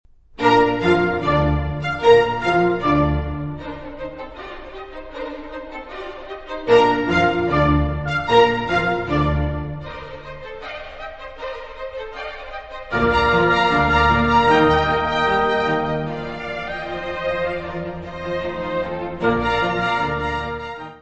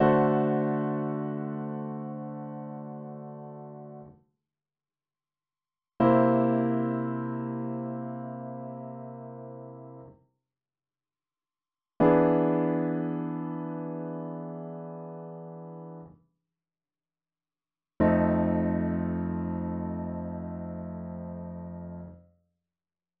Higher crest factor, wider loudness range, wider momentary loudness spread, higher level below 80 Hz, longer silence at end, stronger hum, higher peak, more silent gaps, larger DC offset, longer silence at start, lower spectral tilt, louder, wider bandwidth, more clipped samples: about the same, 18 dB vs 22 dB; second, 10 LU vs 16 LU; about the same, 18 LU vs 20 LU; first, -34 dBFS vs -56 dBFS; second, 0 s vs 1 s; neither; first, -2 dBFS vs -10 dBFS; neither; neither; first, 0.4 s vs 0 s; second, -6.5 dB/octave vs -9 dB/octave; first, -19 LUFS vs -29 LUFS; first, 8.2 kHz vs 4.3 kHz; neither